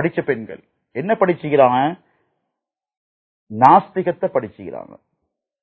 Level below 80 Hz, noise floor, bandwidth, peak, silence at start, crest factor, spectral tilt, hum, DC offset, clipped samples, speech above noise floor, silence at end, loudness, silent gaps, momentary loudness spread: -62 dBFS; -82 dBFS; 6.6 kHz; 0 dBFS; 0 s; 20 dB; -9 dB/octave; none; under 0.1%; under 0.1%; 65 dB; 0.8 s; -17 LUFS; 2.97-3.47 s; 21 LU